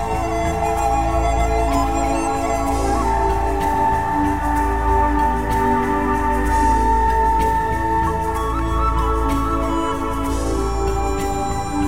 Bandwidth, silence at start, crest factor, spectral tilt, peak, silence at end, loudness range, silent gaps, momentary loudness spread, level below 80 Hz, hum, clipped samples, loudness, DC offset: 16 kHz; 0 s; 12 dB; -6 dB/octave; -6 dBFS; 0 s; 3 LU; none; 5 LU; -24 dBFS; none; under 0.1%; -19 LUFS; 2%